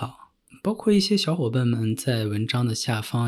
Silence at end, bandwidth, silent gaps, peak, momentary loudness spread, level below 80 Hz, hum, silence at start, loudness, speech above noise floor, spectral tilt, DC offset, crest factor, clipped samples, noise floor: 0 s; 13.5 kHz; none; -10 dBFS; 7 LU; -62 dBFS; none; 0 s; -24 LUFS; 29 dB; -5.5 dB/octave; under 0.1%; 14 dB; under 0.1%; -52 dBFS